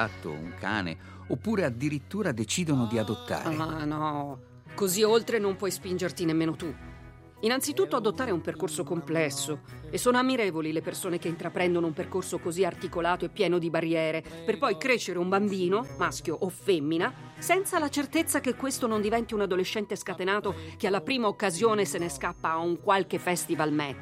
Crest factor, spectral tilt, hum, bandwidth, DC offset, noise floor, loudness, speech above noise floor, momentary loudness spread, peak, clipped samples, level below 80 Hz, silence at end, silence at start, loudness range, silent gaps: 18 dB; -4.5 dB/octave; none; 16 kHz; under 0.1%; -48 dBFS; -29 LUFS; 20 dB; 7 LU; -10 dBFS; under 0.1%; -58 dBFS; 0 s; 0 s; 2 LU; none